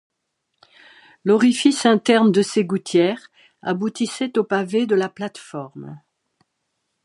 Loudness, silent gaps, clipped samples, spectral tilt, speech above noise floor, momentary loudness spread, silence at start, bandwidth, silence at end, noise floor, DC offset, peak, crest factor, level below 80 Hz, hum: -19 LUFS; none; under 0.1%; -5 dB/octave; 57 dB; 18 LU; 1.25 s; 11.5 kHz; 1.1 s; -75 dBFS; under 0.1%; -2 dBFS; 18 dB; -72 dBFS; none